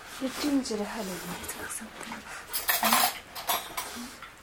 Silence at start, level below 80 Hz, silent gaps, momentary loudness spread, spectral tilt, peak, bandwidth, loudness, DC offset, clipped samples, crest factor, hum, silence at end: 0 s; -58 dBFS; none; 16 LU; -2 dB/octave; -8 dBFS; 17.5 kHz; -30 LUFS; under 0.1%; under 0.1%; 24 dB; none; 0 s